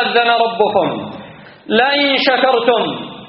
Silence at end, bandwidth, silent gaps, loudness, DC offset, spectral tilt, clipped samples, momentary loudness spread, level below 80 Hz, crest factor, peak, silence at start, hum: 0 s; 5.8 kHz; none; -14 LUFS; under 0.1%; -1 dB/octave; under 0.1%; 11 LU; -60 dBFS; 16 dB; 0 dBFS; 0 s; none